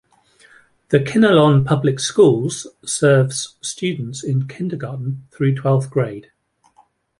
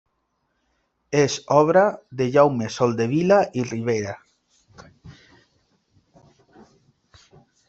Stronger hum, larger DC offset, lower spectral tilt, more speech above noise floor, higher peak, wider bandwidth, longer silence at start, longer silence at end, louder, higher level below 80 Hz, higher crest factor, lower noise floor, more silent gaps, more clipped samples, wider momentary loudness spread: neither; neither; about the same, -6 dB/octave vs -6 dB/octave; second, 39 dB vs 53 dB; about the same, -2 dBFS vs -2 dBFS; first, 11.5 kHz vs 8 kHz; second, 0.9 s vs 1.1 s; second, 1 s vs 2.55 s; about the same, -18 LUFS vs -20 LUFS; first, -56 dBFS vs -62 dBFS; about the same, 16 dB vs 20 dB; second, -57 dBFS vs -72 dBFS; neither; neither; first, 13 LU vs 9 LU